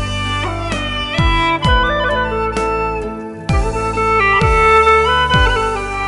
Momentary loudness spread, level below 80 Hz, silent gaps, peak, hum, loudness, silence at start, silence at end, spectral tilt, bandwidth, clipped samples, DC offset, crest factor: 9 LU; -22 dBFS; none; 0 dBFS; none; -14 LUFS; 0 s; 0 s; -5 dB/octave; 11.5 kHz; under 0.1%; under 0.1%; 14 dB